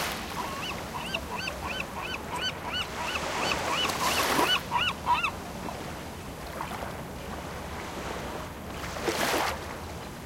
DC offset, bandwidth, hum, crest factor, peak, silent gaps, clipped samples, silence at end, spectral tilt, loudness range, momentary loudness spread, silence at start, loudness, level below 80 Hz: under 0.1%; 17 kHz; none; 22 dB; -10 dBFS; none; under 0.1%; 0 s; -3 dB/octave; 9 LU; 13 LU; 0 s; -31 LUFS; -48 dBFS